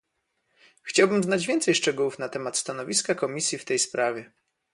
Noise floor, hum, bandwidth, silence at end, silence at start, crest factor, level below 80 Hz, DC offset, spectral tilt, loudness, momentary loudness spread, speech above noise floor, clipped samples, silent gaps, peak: -76 dBFS; none; 11.5 kHz; 0.5 s; 0.85 s; 20 dB; -72 dBFS; under 0.1%; -3 dB/octave; -25 LUFS; 7 LU; 50 dB; under 0.1%; none; -6 dBFS